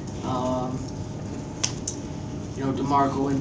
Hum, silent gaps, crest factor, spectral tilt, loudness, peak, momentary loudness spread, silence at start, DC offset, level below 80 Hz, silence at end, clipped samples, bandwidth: none; none; 20 dB; -5 dB/octave; -28 LUFS; -6 dBFS; 11 LU; 0 s; under 0.1%; -44 dBFS; 0 s; under 0.1%; 8 kHz